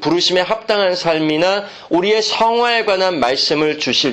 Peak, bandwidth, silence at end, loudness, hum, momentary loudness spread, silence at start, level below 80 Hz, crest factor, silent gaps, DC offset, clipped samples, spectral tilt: -2 dBFS; 8.8 kHz; 0 s; -15 LUFS; none; 3 LU; 0 s; -54 dBFS; 12 dB; none; under 0.1%; under 0.1%; -3.5 dB/octave